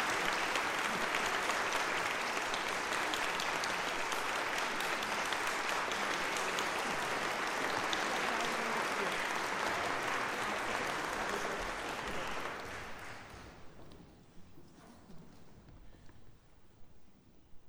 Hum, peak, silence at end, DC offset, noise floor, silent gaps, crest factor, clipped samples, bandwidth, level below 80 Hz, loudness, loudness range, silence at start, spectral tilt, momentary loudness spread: none; -16 dBFS; 0 s; under 0.1%; -59 dBFS; none; 22 dB; under 0.1%; over 20 kHz; -62 dBFS; -35 LUFS; 10 LU; 0 s; -2 dB/octave; 7 LU